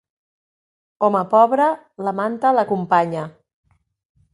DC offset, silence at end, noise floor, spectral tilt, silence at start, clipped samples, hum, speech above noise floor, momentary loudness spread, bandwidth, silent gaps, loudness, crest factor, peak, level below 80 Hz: under 0.1%; 1.05 s; under -90 dBFS; -7.5 dB/octave; 1 s; under 0.1%; none; over 72 dB; 11 LU; 11.5 kHz; none; -18 LUFS; 18 dB; -2 dBFS; -68 dBFS